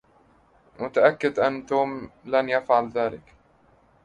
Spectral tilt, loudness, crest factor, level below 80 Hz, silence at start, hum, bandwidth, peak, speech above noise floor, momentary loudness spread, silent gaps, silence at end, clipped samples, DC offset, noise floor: -6 dB/octave; -24 LUFS; 20 dB; -62 dBFS; 0.8 s; none; 9.8 kHz; -4 dBFS; 36 dB; 11 LU; none; 0.9 s; under 0.1%; under 0.1%; -59 dBFS